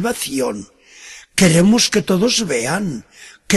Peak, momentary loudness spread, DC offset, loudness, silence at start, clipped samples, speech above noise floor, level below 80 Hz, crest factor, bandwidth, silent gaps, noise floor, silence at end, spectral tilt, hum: -2 dBFS; 19 LU; under 0.1%; -16 LUFS; 0 s; under 0.1%; 24 dB; -48 dBFS; 16 dB; 12.5 kHz; none; -40 dBFS; 0 s; -4 dB/octave; none